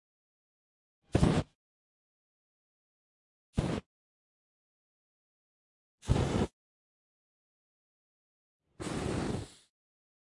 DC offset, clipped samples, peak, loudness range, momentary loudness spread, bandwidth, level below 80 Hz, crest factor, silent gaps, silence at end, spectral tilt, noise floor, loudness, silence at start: under 0.1%; under 0.1%; -12 dBFS; 7 LU; 15 LU; 11.5 kHz; -48 dBFS; 26 dB; 1.55-3.53 s, 3.86-5.98 s, 6.53-8.60 s; 0.8 s; -6.5 dB/octave; under -90 dBFS; -34 LUFS; 1.15 s